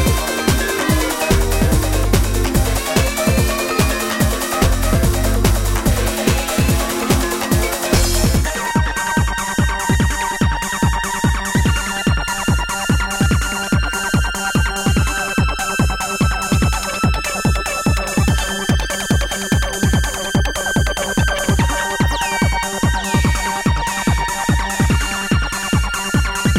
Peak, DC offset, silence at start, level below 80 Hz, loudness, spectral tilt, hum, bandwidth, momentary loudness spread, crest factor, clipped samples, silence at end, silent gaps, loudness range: -2 dBFS; under 0.1%; 0 s; -22 dBFS; -17 LUFS; -4.5 dB/octave; none; 17 kHz; 2 LU; 14 dB; under 0.1%; 0 s; none; 1 LU